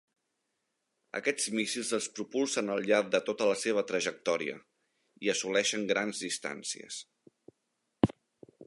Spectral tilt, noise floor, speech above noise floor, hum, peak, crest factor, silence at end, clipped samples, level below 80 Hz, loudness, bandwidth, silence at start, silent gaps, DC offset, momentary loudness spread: -3 dB/octave; -82 dBFS; 50 dB; none; -10 dBFS; 24 dB; 0 s; under 0.1%; -66 dBFS; -31 LUFS; 11.5 kHz; 1.15 s; none; under 0.1%; 10 LU